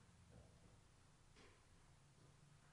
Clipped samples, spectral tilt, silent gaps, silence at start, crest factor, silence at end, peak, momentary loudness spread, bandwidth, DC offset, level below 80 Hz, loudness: under 0.1%; -4.5 dB/octave; none; 0 s; 16 dB; 0 s; -52 dBFS; 2 LU; 11 kHz; under 0.1%; -76 dBFS; -69 LUFS